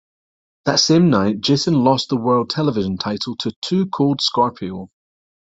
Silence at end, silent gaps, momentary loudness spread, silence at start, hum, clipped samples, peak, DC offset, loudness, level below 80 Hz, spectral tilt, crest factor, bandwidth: 0.65 s; 3.56-3.62 s; 11 LU; 0.65 s; none; under 0.1%; -2 dBFS; under 0.1%; -18 LUFS; -56 dBFS; -5 dB/octave; 18 dB; 8 kHz